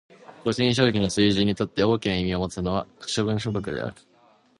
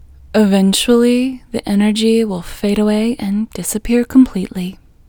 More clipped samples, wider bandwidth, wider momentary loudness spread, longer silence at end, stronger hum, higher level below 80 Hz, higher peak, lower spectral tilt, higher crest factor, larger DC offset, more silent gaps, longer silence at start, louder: neither; second, 11.5 kHz vs over 20 kHz; about the same, 9 LU vs 10 LU; first, 0.7 s vs 0.35 s; neither; second, -46 dBFS vs -38 dBFS; second, -6 dBFS vs 0 dBFS; about the same, -5.5 dB/octave vs -5 dB/octave; about the same, 18 dB vs 14 dB; neither; neither; about the same, 0.3 s vs 0.35 s; second, -24 LUFS vs -15 LUFS